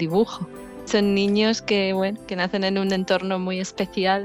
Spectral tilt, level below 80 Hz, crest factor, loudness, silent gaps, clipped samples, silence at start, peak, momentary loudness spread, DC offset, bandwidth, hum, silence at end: -5 dB/octave; -56 dBFS; 16 dB; -23 LUFS; none; under 0.1%; 0 s; -8 dBFS; 7 LU; under 0.1%; 15 kHz; none; 0 s